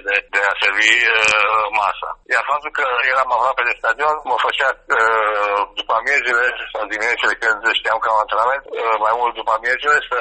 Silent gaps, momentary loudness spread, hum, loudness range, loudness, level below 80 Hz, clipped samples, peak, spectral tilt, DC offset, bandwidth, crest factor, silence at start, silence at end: none; 7 LU; none; 2 LU; -16 LUFS; -52 dBFS; under 0.1%; 0 dBFS; -0.5 dB/octave; under 0.1%; 8.8 kHz; 18 dB; 0.05 s; 0 s